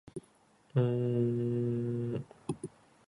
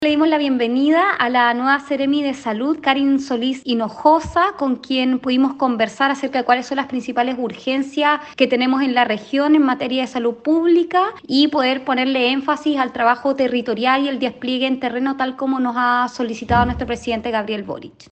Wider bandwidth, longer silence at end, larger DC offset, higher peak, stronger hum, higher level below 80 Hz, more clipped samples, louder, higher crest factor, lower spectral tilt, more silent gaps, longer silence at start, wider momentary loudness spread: first, 10.5 kHz vs 8.6 kHz; first, 0.4 s vs 0.2 s; neither; second, -18 dBFS vs -2 dBFS; neither; second, -68 dBFS vs -46 dBFS; neither; second, -34 LUFS vs -18 LUFS; about the same, 16 dB vs 16 dB; first, -9 dB/octave vs -5 dB/octave; neither; first, 0.15 s vs 0 s; first, 16 LU vs 7 LU